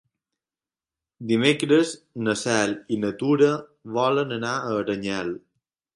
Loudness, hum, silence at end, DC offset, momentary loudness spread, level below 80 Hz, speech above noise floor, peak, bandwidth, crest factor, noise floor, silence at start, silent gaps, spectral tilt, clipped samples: -23 LUFS; none; 0.6 s; under 0.1%; 10 LU; -64 dBFS; over 67 dB; -4 dBFS; 11.5 kHz; 20 dB; under -90 dBFS; 1.2 s; none; -5 dB/octave; under 0.1%